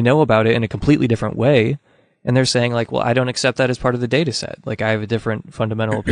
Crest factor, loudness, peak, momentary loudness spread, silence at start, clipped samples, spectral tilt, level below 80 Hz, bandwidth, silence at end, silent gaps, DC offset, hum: 16 dB; -18 LUFS; -2 dBFS; 8 LU; 0 s; under 0.1%; -6 dB/octave; -44 dBFS; 11 kHz; 0 s; none; under 0.1%; none